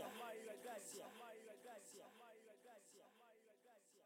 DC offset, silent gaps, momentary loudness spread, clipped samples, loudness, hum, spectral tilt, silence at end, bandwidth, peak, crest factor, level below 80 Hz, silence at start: under 0.1%; none; 13 LU; under 0.1%; -57 LUFS; none; -2 dB/octave; 0 s; 16.5 kHz; -38 dBFS; 20 dB; under -90 dBFS; 0 s